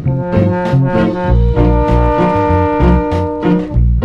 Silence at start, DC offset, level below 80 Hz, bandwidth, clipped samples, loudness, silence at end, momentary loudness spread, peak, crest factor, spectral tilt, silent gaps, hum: 0 s; under 0.1%; -16 dBFS; 6.4 kHz; under 0.1%; -13 LUFS; 0 s; 3 LU; 0 dBFS; 12 dB; -9.5 dB/octave; none; none